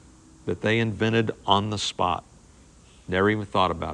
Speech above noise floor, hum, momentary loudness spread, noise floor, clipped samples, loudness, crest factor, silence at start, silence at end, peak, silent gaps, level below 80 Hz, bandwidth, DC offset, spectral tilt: 28 dB; none; 7 LU; -52 dBFS; under 0.1%; -25 LUFS; 22 dB; 0.45 s; 0 s; -2 dBFS; none; -54 dBFS; 10.5 kHz; under 0.1%; -5 dB/octave